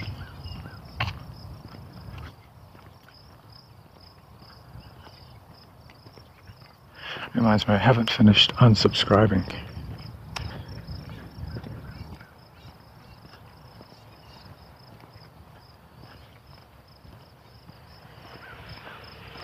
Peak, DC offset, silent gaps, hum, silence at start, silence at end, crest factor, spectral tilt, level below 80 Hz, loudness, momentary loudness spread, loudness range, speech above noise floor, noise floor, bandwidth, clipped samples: -4 dBFS; under 0.1%; none; none; 0 s; 0 s; 24 dB; -6 dB/octave; -48 dBFS; -22 LUFS; 29 LU; 26 LU; 32 dB; -51 dBFS; 15 kHz; under 0.1%